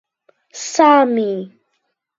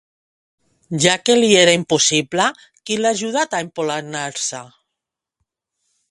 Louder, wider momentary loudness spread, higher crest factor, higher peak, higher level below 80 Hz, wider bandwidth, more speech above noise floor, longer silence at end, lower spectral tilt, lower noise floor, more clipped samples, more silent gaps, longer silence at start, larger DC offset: first, -14 LUFS vs -17 LUFS; first, 23 LU vs 13 LU; about the same, 18 dB vs 20 dB; about the same, 0 dBFS vs 0 dBFS; second, -74 dBFS vs -60 dBFS; second, 7.8 kHz vs 11.5 kHz; second, 56 dB vs 66 dB; second, 0.7 s vs 1.45 s; first, -4 dB/octave vs -2.5 dB/octave; second, -71 dBFS vs -83 dBFS; neither; neither; second, 0.55 s vs 0.9 s; neither